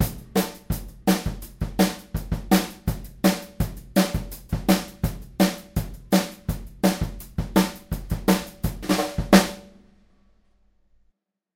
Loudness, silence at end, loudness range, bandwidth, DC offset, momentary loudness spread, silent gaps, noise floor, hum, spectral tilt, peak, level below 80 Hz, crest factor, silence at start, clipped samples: -25 LUFS; 1.9 s; 2 LU; 17 kHz; under 0.1%; 10 LU; none; -68 dBFS; none; -5 dB/octave; 0 dBFS; -36 dBFS; 24 dB; 0 s; under 0.1%